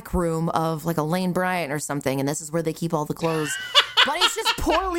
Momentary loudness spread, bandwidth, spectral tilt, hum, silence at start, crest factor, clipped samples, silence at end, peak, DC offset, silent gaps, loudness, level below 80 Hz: 8 LU; 17 kHz; -3.5 dB/octave; none; 0 s; 22 dB; under 0.1%; 0 s; -2 dBFS; under 0.1%; none; -22 LUFS; -42 dBFS